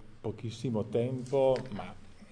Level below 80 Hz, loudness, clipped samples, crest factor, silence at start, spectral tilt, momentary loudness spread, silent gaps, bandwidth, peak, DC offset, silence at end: -56 dBFS; -32 LUFS; under 0.1%; 18 dB; 0 s; -7.5 dB/octave; 14 LU; none; 10 kHz; -16 dBFS; under 0.1%; 0 s